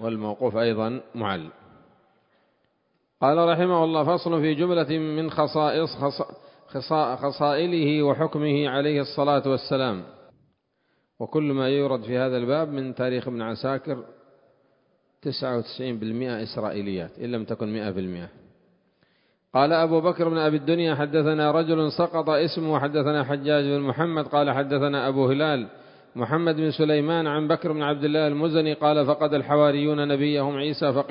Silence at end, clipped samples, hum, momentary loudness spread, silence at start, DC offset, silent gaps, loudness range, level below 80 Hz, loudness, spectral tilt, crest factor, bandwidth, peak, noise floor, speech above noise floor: 0 s; under 0.1%; none; 9 LU; 0 s; under 0.1%; none; 8 LU; -64 dBFS; -24 LUFS; -11 dB/octave; 18 dB; 5.4 kHz; -6 dBFS; -71 dBFS; 48 dB